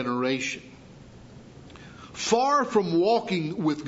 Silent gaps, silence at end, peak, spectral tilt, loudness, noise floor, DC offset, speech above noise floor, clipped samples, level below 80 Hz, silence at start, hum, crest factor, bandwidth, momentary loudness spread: none; 0 s; -8 dBFS; -4.5 dB/octave; -25 LUFS; -47 dBFS; under 0.1%; 23 dB; under 0.1%; -60 dBFS; 0 s; none; 18 dB; 8 kHz; 22 LU